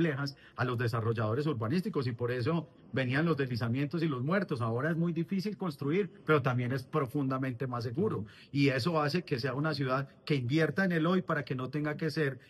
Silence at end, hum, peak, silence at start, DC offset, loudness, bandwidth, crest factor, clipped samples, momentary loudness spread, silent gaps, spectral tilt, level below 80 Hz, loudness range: 0.1 s; none; -14 dBFS; 0 s; under 0.1%; -32 LUFS; 12.5 kHz; 18 dB; under 0.1%; 6 LU; none; -7.5 dB/octave; -68 dBFS; 1 LU